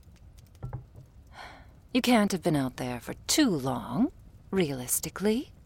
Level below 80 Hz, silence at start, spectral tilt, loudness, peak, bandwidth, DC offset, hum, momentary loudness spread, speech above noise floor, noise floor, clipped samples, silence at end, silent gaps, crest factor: -52 dBFS; 0.25 s; -4 dB/octave; -28 LUFS; -10 dBFS; 16.5 kHz; under 0.1%; none; 20 LU; 25 dB; -52 dBFS; under 0.1%; 0.15 s; none; 20 dB